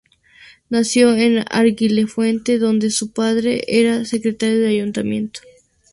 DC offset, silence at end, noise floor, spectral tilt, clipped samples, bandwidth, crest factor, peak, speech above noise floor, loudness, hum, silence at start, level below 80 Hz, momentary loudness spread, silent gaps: under 0.1%; 0.55 s; -47 dBFS; -4.5 dB/octave; under 0.1%; 11.5 kHz; 16 dB; -2 dBFS; 31 dB; -17 LUFS; none; 0.7 s; -56 dBFS; 8 LU; none